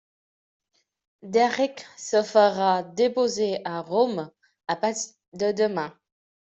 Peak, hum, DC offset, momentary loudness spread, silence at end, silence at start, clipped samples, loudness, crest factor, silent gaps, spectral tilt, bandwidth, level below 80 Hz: -6 dBFS; none; under 0.1%; 14 LU; 0.55 s; 1.25 s; under 0.1%; -24 LUFS; 18 dB; 5.28-5.32 s; -4 dB/octave; 8.2 kHz; -72 dBFS